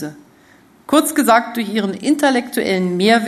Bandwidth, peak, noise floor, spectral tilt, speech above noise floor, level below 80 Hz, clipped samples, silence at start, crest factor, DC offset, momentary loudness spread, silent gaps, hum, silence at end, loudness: 14 kHz; 0 dBFS; -49 dBFS; -4.5 dB/octave; 33 dB; -60 dBFS; under 0.1%; 0 s; 16 dB; under 0.1%; 7 LU; none; none; 0 s; -16 LUFS